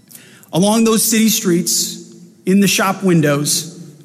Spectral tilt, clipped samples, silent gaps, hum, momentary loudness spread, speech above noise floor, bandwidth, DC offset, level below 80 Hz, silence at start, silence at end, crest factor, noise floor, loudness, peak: -4 dB/octave; under 0.1%; none; none; 10 LU; 28 dB; 16 kHz; under 0.1%; -60 dBFS; 0.55 s; 0.15 s; 12 dB; -42 dBFS; -14 LUFS; -4 dBFS